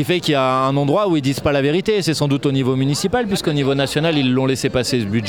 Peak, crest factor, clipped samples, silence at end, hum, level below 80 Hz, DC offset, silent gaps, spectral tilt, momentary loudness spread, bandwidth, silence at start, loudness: -4 dBFS; 14 dB; under 0.1%; 0 s; none; -46 dBFS; 0.2%; none; -5.5 dB/octave; 2 LU; 18.5 kHz; 0 s; -17 LUFS